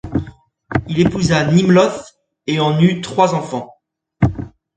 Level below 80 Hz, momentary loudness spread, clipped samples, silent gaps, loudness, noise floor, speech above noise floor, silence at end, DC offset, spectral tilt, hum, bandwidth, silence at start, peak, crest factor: -38 dBFS; 15 LU; under 0.1%; none; -16 LUFS; -37 dBFS; 23 dB; 0.3 s; under 0.1%; -6.5 dB/octave; none; 9.2 kHz; 0.05 s; 0 dBFS; 16 dB